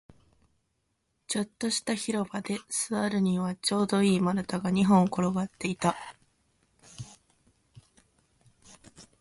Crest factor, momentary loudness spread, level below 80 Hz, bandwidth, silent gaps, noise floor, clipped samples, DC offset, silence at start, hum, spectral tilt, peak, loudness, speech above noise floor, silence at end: 20 dB; 15 LU; -64 dBFS; 11.5 kHz; none; -77 dBFS; under 0.1%; under 0.1%; 1.3 s; none; -5 dB/octave; -10 dBFS; -28 LUFS; 49 dB; 0.15 s